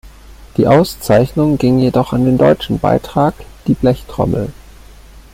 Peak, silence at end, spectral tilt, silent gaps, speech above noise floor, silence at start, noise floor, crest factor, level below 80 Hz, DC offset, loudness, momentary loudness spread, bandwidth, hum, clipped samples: 0 dBFS; 0.15 s; -7.5 dB/octave; none; 25 dB; 0.05 s; -38 dBFS; 14 dB; -34 dBFS; under 0.1%; -14 LUFS; 7 LU; 16.5 kHz; none; under 0.1%